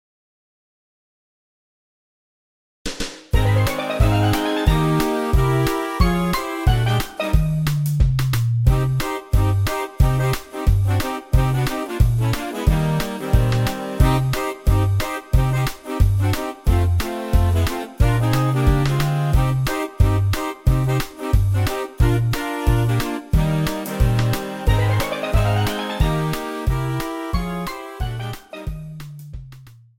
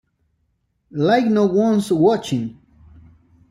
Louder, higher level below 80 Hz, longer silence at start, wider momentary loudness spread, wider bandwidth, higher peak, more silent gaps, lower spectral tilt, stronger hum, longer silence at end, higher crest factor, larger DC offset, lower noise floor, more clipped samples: about the same, -20 LUFS vs -18 LUFS; first, -24 dBFS vs -56 dBFS; first, 2.85 s vs 0.95 s; second, 7 LU vs 11 LU; first, 17 kHz vs 14 kHz; about the same, -2 dBFS vs -4 dBFS; neither; about the same, -6.5 dB/octave vs -6.5 dB/octave; neither; second, 0.3 s vs 1 s; about the same, 18 dB vs 16 dB; neither; second, -43 dBFS vs -68 dBFS; neither